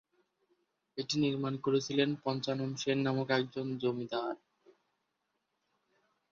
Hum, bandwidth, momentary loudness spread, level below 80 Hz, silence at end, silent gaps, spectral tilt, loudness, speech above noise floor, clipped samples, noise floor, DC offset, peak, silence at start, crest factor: none; 7.6 kHz; 7 LU; -76 dBFS; 1.95 s; none; -5.5 dB/octave; -34 LUFS; 50 dB; under 0.1%; -83 dBFS; under 0.1%; -16 dBFS; 0.95 s; 20 dB